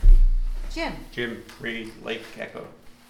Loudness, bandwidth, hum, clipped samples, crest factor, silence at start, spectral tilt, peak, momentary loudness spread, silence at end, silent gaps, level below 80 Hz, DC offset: -30 LUFS; 5.8 kHz; none; under 0.1%; 18 dB; 0 s; -6 dB/octave; -4 dBFS; 12 LU; 0.2 s; none; -22 dBFS; under 0.1%